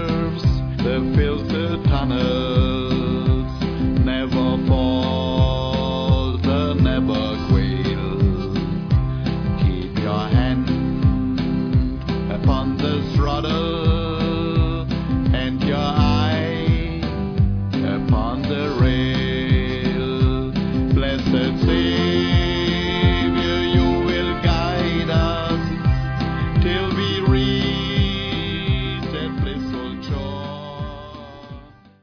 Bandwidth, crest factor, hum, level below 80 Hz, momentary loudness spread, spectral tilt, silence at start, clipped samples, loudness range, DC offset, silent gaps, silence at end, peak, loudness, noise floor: 5.4 kHz; 14 dB; none; -28 dBFS; 6 LU; -7.5 dB/octave; 0 s; under 0.1%; 2 LU; under 0.1%; none; 0.35 s; -4 dBFS; -20 LUFS; -41 dBFS